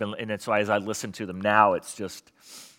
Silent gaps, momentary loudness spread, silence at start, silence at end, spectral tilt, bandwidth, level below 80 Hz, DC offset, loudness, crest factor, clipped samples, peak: none; 17 LU; 0 s; 0.1 s; -4 dB/octave; 17 kHz; -72 dBFS; under 0.1%; -25 LUFS; 22 dB; under 0.1%; -4 dBFS